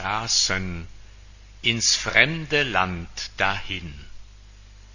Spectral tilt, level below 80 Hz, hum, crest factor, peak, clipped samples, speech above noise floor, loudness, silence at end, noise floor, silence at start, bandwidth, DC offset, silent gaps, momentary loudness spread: -2 dB/octave; -44 dBFS; 50 Hz at -45 dBFS; 24 dB; -2 dBFS; under 0.1%; 22 dB; -22 LUFS; 0 s; -46 dBFS; 0 s; 7.4 kHz; under 0.1%; none; 15 LU